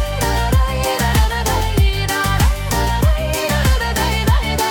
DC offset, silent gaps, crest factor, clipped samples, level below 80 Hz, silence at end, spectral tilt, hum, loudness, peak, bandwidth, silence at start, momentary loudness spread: under 0.1%; none; 12 dB; under 0.1%; -20 dBFS; 0 s; -4.5 dB/octave; none; -17 LUFS; -2 dBFS; 19 kHz; 0 s; 2 LU